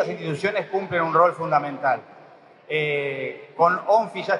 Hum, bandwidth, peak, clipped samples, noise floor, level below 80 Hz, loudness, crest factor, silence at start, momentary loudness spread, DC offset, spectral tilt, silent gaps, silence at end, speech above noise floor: none; 11 kHz; -4 dBFS; under 0.1%; -49 dBFS; -74 dBFS; -23 LUFS; 20 dB; 0 s; 9 LU; under 0.1%; -6 dB/octave; none; 0 s; 27 dB